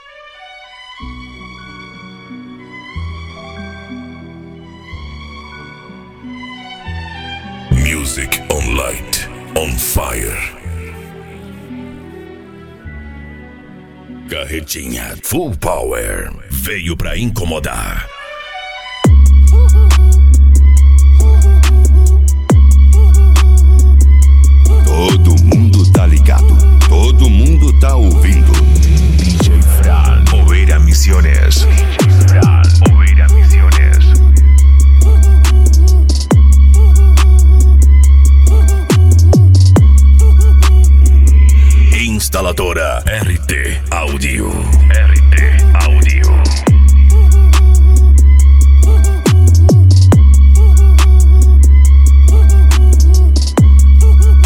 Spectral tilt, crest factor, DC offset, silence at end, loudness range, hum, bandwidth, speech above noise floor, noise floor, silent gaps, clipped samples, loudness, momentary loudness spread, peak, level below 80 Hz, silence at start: -6 dB/octave; 8 dB; under 0.1%; 0 s; 17 LU; none; 15.5 kHz; 27 dB; -36 dBFS; none; under 0.1%; -9 LUFS; 17 LU; 0 dBFS; -8 dBFS; 1 s